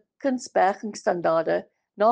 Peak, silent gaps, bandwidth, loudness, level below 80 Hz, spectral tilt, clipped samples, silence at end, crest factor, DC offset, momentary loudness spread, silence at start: -8 dBFS; none; 9.6 kHz; -25 LUFS; -76 dBFS; -5 dB/octave; under 0.1%; 0 s; 16 dB; under 0.1%; 5 LU; 0.25 s